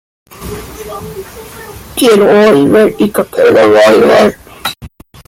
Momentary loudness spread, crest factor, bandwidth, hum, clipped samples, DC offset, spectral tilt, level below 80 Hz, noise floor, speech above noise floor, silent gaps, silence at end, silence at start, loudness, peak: 23 LU; 10 dB; 16.5 kHz; none; under 0.1%; under 0.1%; -5 dB/octave; -40 dBFS; -33 dBFS; 25 dB; none; 0.4 s; 0.4 s; -7 LUFS; 0 dBFS